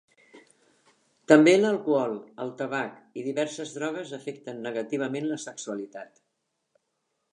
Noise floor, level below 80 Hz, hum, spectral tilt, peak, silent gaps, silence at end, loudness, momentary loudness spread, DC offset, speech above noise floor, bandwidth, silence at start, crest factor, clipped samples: -79 dBFS; -84 dBFS; none; -5 dB/octave; -2 dBFS; none; 1.25 s; -26 LUFS; 18 LU; under 0.1%; 53 dB; 11 kHz; 0.35 s; 26 dB; under 0.1%